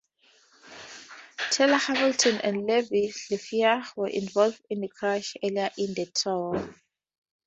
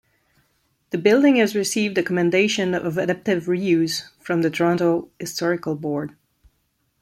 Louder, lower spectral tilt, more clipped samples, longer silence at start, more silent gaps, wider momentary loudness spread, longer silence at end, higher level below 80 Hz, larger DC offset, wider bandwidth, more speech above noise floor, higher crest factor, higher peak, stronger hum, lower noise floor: second, -26 LUFS vs -21 LUFS; second, -3 dB/octave vs -5 dB/octave; neither; second, 0.65 s vs 0.95 s; neither; first, 19 LU vs 10 LU; second, 0.75 s vs 0.9 s; second, -68 dBFS vs -62 dBFS; neither; second, 8.4 kHz vs 14.5 kHz; second, 36 dB vs 49 dB; about the same, 20 dB vs 18 dB; second, -8 dBFS vs -4 dBFS; neither; second, -62 dBFS vs -69 dBFS